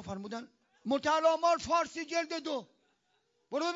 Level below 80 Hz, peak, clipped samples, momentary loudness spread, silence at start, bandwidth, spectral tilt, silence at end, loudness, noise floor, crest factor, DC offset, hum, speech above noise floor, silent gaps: -70 dBFS; -16 dBFS; under 0.1%; 14 LU; 0 s; 7.4 kHz; -2 dB/octave; 0 s; -32 LUFS; -76 dBFS; 18 dB; under 0.1%; none; 44 dB; none